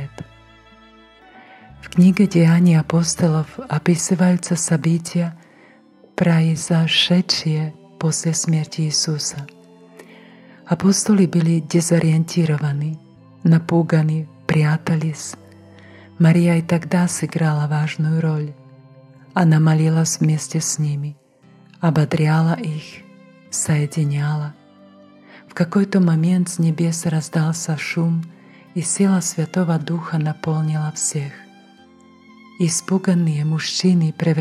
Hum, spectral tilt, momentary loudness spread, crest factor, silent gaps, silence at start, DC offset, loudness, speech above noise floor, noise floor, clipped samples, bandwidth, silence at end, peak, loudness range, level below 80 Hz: none; -5.5 dB/octave; 11 LU; 14 dB; none; 0 s; under 0.1%; -18 LUFS; 32 dB; -50 dBFS; under 0.1%; 13 kHz; 0 s; -4 dBFS; 4 LU; -60 dBFS